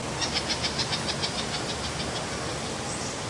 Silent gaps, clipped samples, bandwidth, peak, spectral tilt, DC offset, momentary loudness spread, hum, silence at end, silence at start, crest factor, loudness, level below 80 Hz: none; under 0.1%; 11.5 kHz; -12 dBFS; -3 dB/octave; under 0.1%; 5 LU; none; 0 s; 0 s; 18 dB; -28 LUFS; -48 dBFS